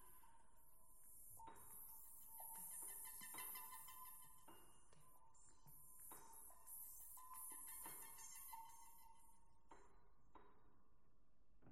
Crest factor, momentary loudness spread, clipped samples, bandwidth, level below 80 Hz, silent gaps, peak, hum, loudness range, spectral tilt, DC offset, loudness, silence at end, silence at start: 24 dB; 15 LU; under 0.1%; 16 kHz; -80 dBFS; none; -38 dBFS; none; 7 LU; -1 dB/octave; under 0.1%; -56 LUFS; 0 s; 0 s